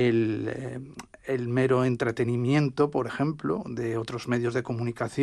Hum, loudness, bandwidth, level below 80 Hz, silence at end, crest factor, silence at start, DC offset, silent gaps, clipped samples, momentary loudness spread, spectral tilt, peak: none; -27 LUFS; 11.5 kHz; -60 dBFS; 0 s; 18 dB; 0 s; under 0.1%; none; under 0.1%; 10 LU; -7.5 dB/octave; -10 dBFS